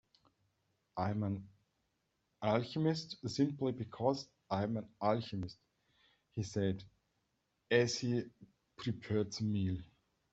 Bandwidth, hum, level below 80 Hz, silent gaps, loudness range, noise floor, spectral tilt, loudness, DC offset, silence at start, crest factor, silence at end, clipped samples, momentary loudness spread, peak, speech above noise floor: 8.2 kHz; none; -70 dBFS; none; 3 LU; -82 dBFS; -6 dB/octave; -37 LUFS; under 0.1%; 0.95 s; 22 dB; 0.45 s; under 0.1%; 10 LU; -16 dBFS; 46 dB